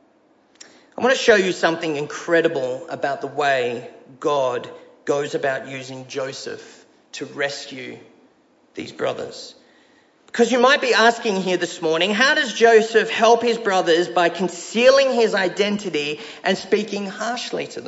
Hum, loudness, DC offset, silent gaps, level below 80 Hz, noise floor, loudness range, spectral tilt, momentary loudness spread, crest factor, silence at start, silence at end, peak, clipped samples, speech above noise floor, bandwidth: none; -19 LUFS; under 0.1%; none; -68 dBFS; -58 dBFS; 13 LU; -3.5 dB/octave; 18 LU; 18 dB; 1 s; 0 s; -2 dBFS; under 0.1%; 38 dB; 8 kHz